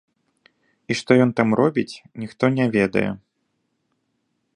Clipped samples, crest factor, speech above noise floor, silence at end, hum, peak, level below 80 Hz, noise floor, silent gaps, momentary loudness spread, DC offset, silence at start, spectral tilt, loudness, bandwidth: under 0.1%; 20 dB; 53 dB; 1.4 s; none; -2 dBFS; -58 dBFS; -72 dBFS; none; 16 LU; under 0.1%; 0.9 s; -6.5 dB/octave; -20 LUFS; 10.5 kHz